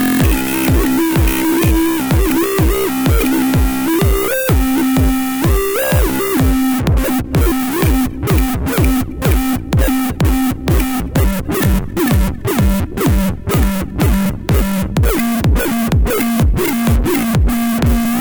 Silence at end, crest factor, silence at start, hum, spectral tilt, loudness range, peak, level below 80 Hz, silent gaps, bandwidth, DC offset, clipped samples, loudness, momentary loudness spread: 0 s; 12 dB; 0 s; none; -6 dB/octave; 2 LU; -2 dBFS; -18 dBFS; none; over 20 kHz; under 0.1%; under 0.1%; -15 LUFS; 3 LU